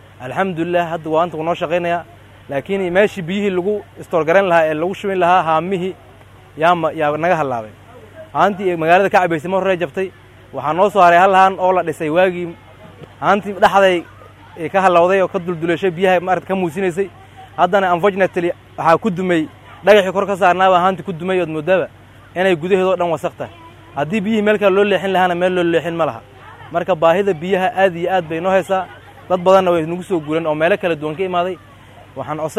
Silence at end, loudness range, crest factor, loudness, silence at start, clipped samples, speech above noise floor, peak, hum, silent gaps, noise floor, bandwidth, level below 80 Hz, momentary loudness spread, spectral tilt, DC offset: 0 s; 4 LU; 16 dB; -16 LUFS; 0.2 s; under 0.1%; 27 dB; 0 dBFS; none; none; -42 dBFS; 14.5 kHz; -54 dBFS; 12 LU; -6 dB/octave; under 0.1%